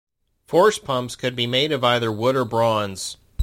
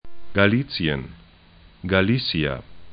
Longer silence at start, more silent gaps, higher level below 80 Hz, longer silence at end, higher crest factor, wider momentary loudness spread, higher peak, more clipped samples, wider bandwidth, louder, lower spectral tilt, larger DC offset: first, 0.5 s vs 0.05 s; neither; second, -58 dBFS vs -44 dBFS; about the same, 0 s vs 0 s; about the same, 18 dB vs 22 dB; second, 9 LU vs 15 LU; about the same, -4 dBFS vs -2 dBFS; neither; first, 16.5 kHz vs 5.2 kHz; about the same, -21 LUFS vs -22 LUFS; second, -4.5 dB/octave vs -11 dB/octave; neither